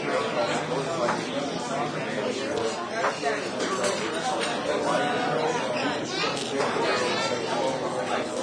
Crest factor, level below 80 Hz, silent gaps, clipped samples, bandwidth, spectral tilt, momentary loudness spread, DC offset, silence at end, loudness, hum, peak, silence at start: 14 dB; -66 dBFS; none; under 0.1%; 10.5 kHz; -3.5 dB/octave; 4 LU; under 0.1%; 0 s; -27 LUFS; none; -12 dBFS; 0 s